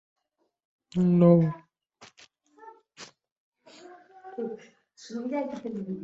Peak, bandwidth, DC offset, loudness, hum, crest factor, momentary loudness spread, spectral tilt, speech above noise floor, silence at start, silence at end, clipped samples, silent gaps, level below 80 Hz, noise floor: -6 dBFS; 7.6 kHz; under 0.1%; -26 LUFS; none; 22 dB; 28 LU; -9 dB/octave; 34 dB; 0.95 s; 0 s; under 0.1%; 3.32-3.52 s; -68 dBFS; -59 dBFS